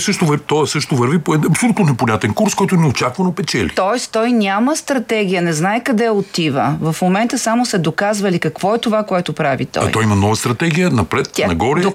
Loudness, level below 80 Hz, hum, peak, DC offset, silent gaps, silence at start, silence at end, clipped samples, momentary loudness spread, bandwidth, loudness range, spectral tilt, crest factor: -16 LUFS; -46 dBFS; none; 0 dBFS; under 0.1%; none; 0 s; 0 s; under 0.1%; 3 LU; 16 kHz; 1 LU; -5 dB/octave; 14 dB